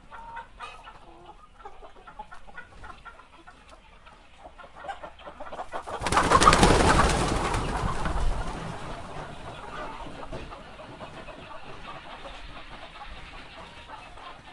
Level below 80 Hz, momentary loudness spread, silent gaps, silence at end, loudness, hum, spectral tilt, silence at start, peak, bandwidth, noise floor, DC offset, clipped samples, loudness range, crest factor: -36 dBFS; 26 LU; none; 0 s; -25 LUFS; none; -4 dB/octave; 0.05 s; 0 dBFS; 11.5 kHz; -51 dBFS; under 0.1%; under 0.1%; 23 LU; 28 dB